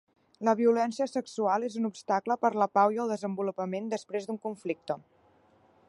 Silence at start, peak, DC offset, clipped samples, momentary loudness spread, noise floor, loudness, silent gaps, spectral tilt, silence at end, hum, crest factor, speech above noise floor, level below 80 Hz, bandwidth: 0.4 s; -10 dBFS; under 0.1%; under 0.1%; 11 LU; -64 dBFS; -30 LUFS; none; -6 dB/octave; 0.9 s; none; 20 dB; 35 dB; -80 dBFS; 11.5 kHz